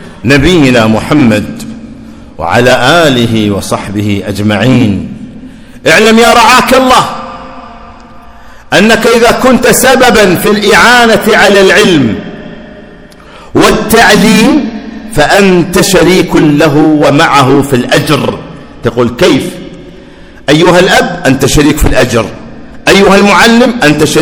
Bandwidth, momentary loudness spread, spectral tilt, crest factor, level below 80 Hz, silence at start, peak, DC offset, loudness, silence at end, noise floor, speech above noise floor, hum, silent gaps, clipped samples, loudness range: over 20 kHz; 15 LU; -4.5 dB/octave; 6 dB; -26 dBFS; 0 s; 0 dBFS; under 0.1%; -5 LUFS; 0 s; -31 dBFS; 26 dB; none; none; 10%; 4 LU